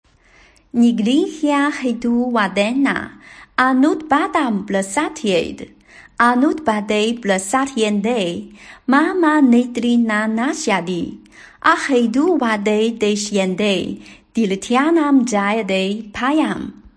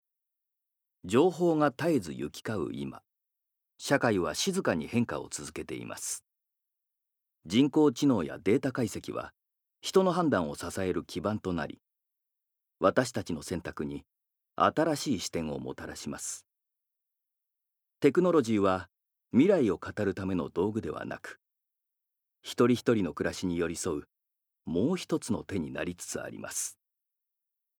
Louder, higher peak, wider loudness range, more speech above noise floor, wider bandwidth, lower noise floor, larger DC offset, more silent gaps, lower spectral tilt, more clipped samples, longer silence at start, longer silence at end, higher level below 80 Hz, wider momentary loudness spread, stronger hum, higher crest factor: first, -17 LUFS vs -30 LUFS; first, 0 dBFS vs -8 dBFS; second, 2 LU vs 6 LU; second, 34 dB vs 55 dB; second, 10.5 kHz vs 20 kHz; second, -51 dBFS vs -84 dBFS; neither; neither; about the same, -4.5 dB/octave vs -5 dB/octave; neither; second, 0.75 s vs 1.05 s; second, 0.25 s vs 1.05 s; first, -54 dBFS vs -64 dBFS; second, 10 LU vs 14 LU; neither; second, 16 dB vs 22 dB